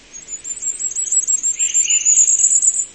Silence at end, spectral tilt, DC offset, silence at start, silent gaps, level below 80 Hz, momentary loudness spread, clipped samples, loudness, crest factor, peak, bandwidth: 0 s; 3.5 dB/octave; 0.1%; 0.15 s; none; -58 dBFS; 14 LU; under 0.1%; -13 LUFS; 16 dB; -2 dBFS; 8.8 kHz